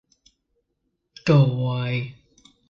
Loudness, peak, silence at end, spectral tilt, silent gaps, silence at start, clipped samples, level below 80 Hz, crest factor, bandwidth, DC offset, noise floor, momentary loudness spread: -22 LUFS; -6 dBFS; 0.6 s; -8 dB/octave; none; 1.25 s; under 0.1%; -56 dBFS; 18 dB; 7.2 kHz; under 0.1%; -76 dBFS; 11 LU